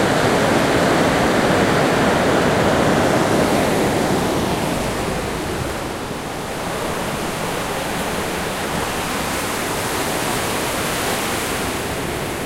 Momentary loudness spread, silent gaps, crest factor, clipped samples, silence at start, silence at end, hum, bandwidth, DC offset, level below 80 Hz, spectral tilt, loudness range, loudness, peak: 8 LU; none; 16 dB; under 0.1%; 0 s; 0 s; none; 16 kHz; under 0.1%; -38 dBFS; -4 dB/octave; 7 LU; -19 LUFS; -2 dBFS